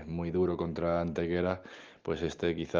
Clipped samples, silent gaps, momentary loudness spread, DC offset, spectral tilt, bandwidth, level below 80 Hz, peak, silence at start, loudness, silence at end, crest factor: under 0.1%; none; 8 LU; under 0.1%; -7 dB/octave; 7.4 kHz; -58 dBFS; -14 dBFS; 0 s; -33 LUFS; 0 s; 18 dB